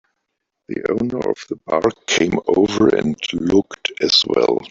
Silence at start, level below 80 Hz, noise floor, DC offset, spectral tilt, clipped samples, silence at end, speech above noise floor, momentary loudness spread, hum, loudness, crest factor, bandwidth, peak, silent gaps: 0.7 s; -50 dBFS; -76 dBFS; under 0.1%; -4 dB/octave; under 0.1%; 0.05 s; 59 dB; 9 LU; none; -18 LUFS; 16 dB; 7.8 kHz; -2 dBFS; none